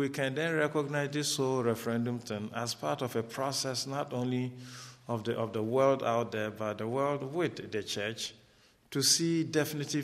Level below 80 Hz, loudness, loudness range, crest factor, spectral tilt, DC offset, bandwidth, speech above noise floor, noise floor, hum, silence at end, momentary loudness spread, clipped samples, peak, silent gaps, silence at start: -74 dBFS; -32 LUFS; 3 LU; 20 dB; -4 dB/octave; under 0.1%; 15 kHz; 32 dB; -64 dBFS; none; 0 s; 10 LU; under 0.1%; -12 dBFS; none; 0 s